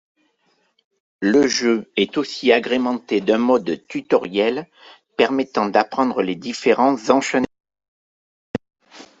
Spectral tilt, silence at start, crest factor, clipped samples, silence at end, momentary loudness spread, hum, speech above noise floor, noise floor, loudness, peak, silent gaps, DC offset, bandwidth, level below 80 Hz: -4 dB/octave; 1.2 s; 18 dB; under 0.1%; 0.15 s; 11 LU; none; 46 dB; -65 dBFS; -19 LUFS; -2 dBFS; 7.88-8.54 s; under 0.1%; 8 kHz; -62 dBFS